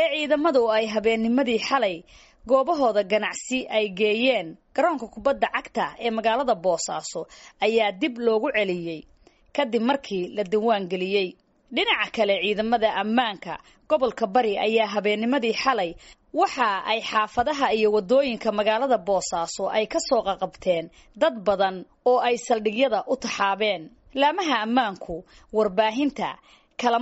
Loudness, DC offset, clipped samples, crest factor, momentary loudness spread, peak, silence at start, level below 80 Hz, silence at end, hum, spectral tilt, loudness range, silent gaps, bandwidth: -24 LUFS; under 0.1%; under 0.1%; 18 dB; 8 LU; -6 dBFS; 0 s; -58 dBFS; 0 s; none; -2 dB/octave; 2 LU; none; 8 kHz